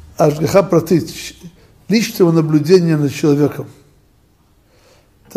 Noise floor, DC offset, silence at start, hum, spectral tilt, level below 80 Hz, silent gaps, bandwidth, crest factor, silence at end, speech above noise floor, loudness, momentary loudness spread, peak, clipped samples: -53 dBFS; under 0.1%; 0.2 s; none; -6.5 dB/octave; -50 dBFS; none; 15.5 kHz; 16 dB; 1.65 s; 40 dB; -14 LUFS; 16 LU; 0 dBFS; under 0.1%